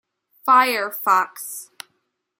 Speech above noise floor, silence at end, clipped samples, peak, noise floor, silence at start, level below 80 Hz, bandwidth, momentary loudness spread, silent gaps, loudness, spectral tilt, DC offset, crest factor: 53 dB; 0.75 s; under 0.1%; -4 dBFS; -72 dBFS; 0.45 s; -82 dBFS; 17 kHz; 18 LU; none; -18 LUFS; -1 dB/octave; under 0.1%; 18 dB